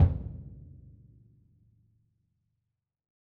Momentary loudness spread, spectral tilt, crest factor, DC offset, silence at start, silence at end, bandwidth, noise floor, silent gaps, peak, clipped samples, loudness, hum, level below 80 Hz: 24 LU; -11 dB/octave; 24 dB; under 0.1%; 0 s; 2.7 s; 2.4 kHz; -85 dBFS; none; -10 dBFS; under 0.1%; -34 LUFS; none; -42 dBFS